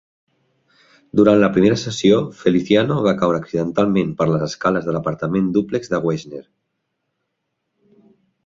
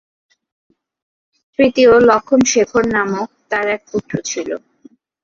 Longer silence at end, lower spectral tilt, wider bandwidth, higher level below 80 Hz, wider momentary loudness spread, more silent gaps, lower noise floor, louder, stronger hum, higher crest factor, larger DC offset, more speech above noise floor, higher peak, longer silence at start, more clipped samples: first, 2.05 s vs 0.65 s; first, -6.5 dB/octave vs -4 dB/octave; about the same, 7.8 kHz vs 7.6 kHz; about the same, -52 dBFS vs -50 dBFS; second, 8 LU vs 14 LU; neither; first, -75 dBFS vs -48 dBFS; second, -18 LUFS vs -15 LUFS; neither; about the same, 18 dB vs 16 dB; neither; first, 58 dB vs 34 dB; about the same, 0 dBFS vs -2 dBFS; second, 1.15 s vs 1.6 s; neither